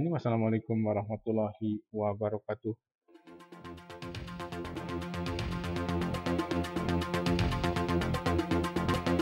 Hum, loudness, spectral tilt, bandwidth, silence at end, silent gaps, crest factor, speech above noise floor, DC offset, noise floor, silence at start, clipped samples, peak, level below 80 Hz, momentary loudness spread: none; -33 LUFS; -7 dB/octave; 16 kHz; 0 s; 2.95-2.99 s; 14 dB; 22 dB; under 0.1%; -55 dBFS; 0 s; under 0.1%; -18 dBFS; -50 dBFS; 12 LU